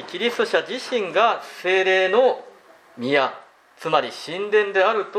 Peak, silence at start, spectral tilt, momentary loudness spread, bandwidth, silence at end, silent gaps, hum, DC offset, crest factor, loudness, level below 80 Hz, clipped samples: -4 dBFS; 0 s; -3.5 dB/octave; 11 LU; 14.5 kHz; 0 s; none; none; under 0.1%; 18 dB; -21 LUFS; -80 dBFS; under 0.1%